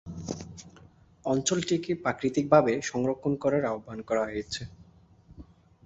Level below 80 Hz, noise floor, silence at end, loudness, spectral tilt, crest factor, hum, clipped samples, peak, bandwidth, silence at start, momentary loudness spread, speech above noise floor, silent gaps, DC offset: -58 dBFS; -56 dBFS; 0.45 s; -28 LUFS; -5 dB/octave; 24 dB; none; under 0.1%; -6 dBFS; 8.2 kHz; 0.05 s; 16 LU; 29 dB; none; under 0.1%